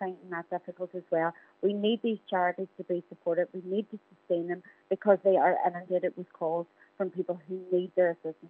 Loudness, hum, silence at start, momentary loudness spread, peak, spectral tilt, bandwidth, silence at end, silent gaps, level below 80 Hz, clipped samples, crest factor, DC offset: -31 LUFS; none; 0 s; 13 LU; -10 dBFS; -9 dB/octave; 4 kHz; 0 s; none; under -90 dBFS; under 0.1%; 22 dB; under 0.1%